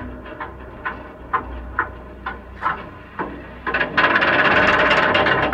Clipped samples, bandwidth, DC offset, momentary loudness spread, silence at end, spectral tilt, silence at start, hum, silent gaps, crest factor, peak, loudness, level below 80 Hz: under 0.1%; 10 kHz; under 0.1%; 19 LU; 0 s; -5 dB/octave; 0 s; none; none; 18 dB; -2 dBFS; -18 LUFS; -40 dBFS